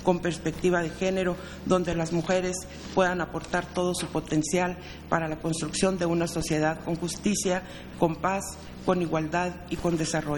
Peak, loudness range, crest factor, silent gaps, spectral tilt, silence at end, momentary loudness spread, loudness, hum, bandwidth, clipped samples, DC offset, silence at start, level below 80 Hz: -6 dBFS; 1 LU; 22 dB; none; -5 dB/octave; 0 s; 6 LU; -28 LUFS; none; 19.5 kHz; under 0.1%; under 0.1%; 0 s; -48 dBFS